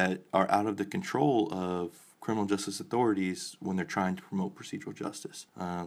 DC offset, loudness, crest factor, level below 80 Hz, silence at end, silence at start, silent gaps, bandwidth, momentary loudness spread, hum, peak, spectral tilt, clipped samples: under 0.1%; -32 LUFS; 22 dB; -72 dBFS; 0 s; 0 s; none; 15 kHz; 13 LU; none; -10 dBFS; -5.5 dB/octave; under 0.1%